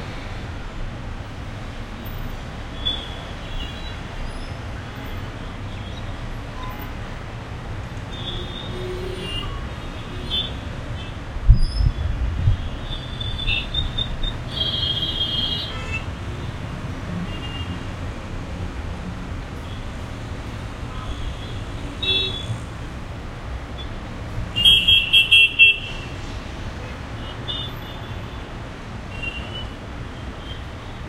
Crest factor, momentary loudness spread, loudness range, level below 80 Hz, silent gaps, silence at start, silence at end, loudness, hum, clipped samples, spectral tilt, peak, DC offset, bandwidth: 24 dB; 14 LU; 17 LU; -30 dBFS; none; 0 s; 0 s; -23 LUFS; none; under 0.1%; -4 dB/octave; 0 dBFS; under 0.1%; 15.5 kHz